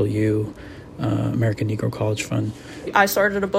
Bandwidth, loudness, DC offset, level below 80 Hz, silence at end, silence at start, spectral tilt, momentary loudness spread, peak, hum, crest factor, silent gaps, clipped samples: 16 kHz; -22 LUFS; under 0.1%; -48 dBFS; 0 s; 0 s; -6 dB/octave; 13 LU; -2 dBFS; none; 20 dB; none; under 0.1%